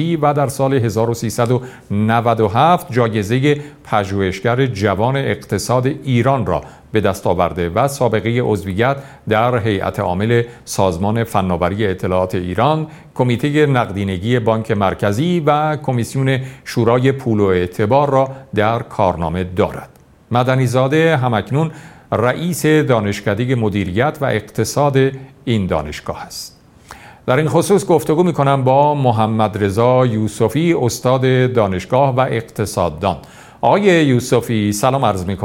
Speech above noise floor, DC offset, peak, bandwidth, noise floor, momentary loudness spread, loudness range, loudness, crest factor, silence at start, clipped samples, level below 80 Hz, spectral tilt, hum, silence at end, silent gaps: 25 dB; under 0.1%; 0 dBFS; 16.5 kHz; -40 dBFS; 7 LU; 3 LU; -16 LUFS; 16 dB; 0 s; under 0.1%; -44 dBFS; -6.5 dB/octave; none; 0 s; none